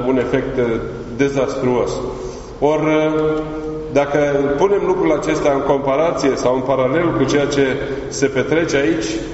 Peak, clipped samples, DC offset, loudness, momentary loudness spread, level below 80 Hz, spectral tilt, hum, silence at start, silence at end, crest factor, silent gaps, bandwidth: 0 dBFS; under 0.1%; under 0.1%; -17 LUFS; 7 LU; -38 dBFS; -5 dB/octave; none; 0 s; 0 s; 16 dB; none; 8 kHz